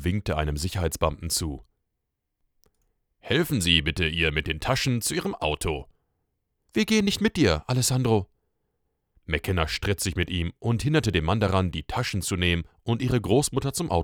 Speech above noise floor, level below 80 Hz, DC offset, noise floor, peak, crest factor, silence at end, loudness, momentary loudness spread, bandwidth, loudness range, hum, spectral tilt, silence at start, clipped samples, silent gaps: 56 dB; -42 dBFS; under 0.1%; -81 dBFS; -6 dBFS; 20 dB; 0 s; -25 LUFS; 7 LU; over 20 kHz; 2 LU; none; -4.5 dB/octave; 0 s; under 0.1%; none